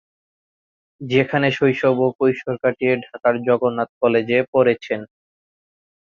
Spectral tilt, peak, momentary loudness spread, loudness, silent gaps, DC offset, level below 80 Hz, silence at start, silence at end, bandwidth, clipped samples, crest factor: -7.5 dB/octave; -2 dBFS; 5 LU; -19 LUFS; 2.15-2.19 s, 3.89-4.01 s, 4.48-4.53 s; under 0.1%; -62 dBFS; 1 s; 1.1 s; 7 kHz; under 0.1%; 18 dB